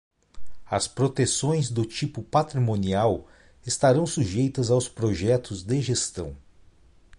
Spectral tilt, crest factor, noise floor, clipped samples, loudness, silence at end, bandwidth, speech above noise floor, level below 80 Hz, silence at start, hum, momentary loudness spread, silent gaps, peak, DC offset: -5.5 dB/octave; 16 dB; -54 dBFS; under 0.1%; -25 LUFS; 0.8 s; 11.5 kHz; 30 dB; -48 dBFS; 0.35 s; none; 8 LU; none; -8 dBFS; under 0.1%